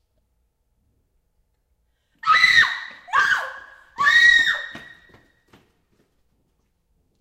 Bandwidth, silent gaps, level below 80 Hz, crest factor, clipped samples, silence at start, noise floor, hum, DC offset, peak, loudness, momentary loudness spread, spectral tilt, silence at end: 15.5 kHz; none; -58 dBFS; 22 dB; under 0.1%; 2.25 s; -69 dBFS; none; under 0.1%; -2 dBFS; -16 LUFS; 17 LU; 0.5 dB/octave; 2.4 s